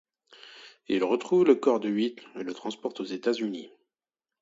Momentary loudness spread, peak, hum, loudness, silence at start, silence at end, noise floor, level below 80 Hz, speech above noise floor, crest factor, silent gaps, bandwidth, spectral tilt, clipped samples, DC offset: 23 LU; -8 dBFS; none; -27 LUFS; 0.45 s; 0.75 s; under -90 dBFS; -76 dBFS; over 63 dB; 22 dB; none; 7.8 kHz; -6 dB/octave; under 0.1%; under 0.1%